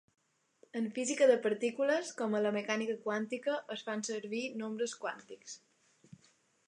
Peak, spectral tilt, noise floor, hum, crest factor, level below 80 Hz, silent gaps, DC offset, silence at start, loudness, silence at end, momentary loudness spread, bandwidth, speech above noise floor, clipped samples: -16 dBFS; -3.5 dB/octave; -70 dBFS; none; 20 dB; under -90 dBFS; none; under 0.1%; 0.75 s; -34 LUFS; 1.1 s; 16 LU; 11 kHz; 36 dB; under 0.1%